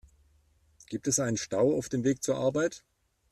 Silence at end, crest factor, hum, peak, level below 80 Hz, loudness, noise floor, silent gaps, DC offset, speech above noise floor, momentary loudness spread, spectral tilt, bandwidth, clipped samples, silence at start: 0.55 s; 16 dB; none; -14 dBFS; -64 dBFS; -29 LUFS; -66 dBFS; none; under 0.1%; 37 dB; 8 LU; -4.5 dB/octave; 14 kHz; under 0.1%; 0.9 s